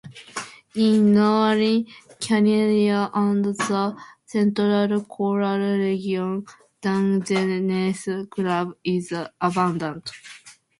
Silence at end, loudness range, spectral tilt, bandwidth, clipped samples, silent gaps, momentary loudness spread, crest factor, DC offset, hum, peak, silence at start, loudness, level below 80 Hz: 0.3 s; 5 LU; -6 dB/octave; 11.5 kHz; under 0.1%; none; 14 LU; 16 dB; under 0.1%; none; -6 dBFS; 0.05 s; -22 LUFS; -66 dBFS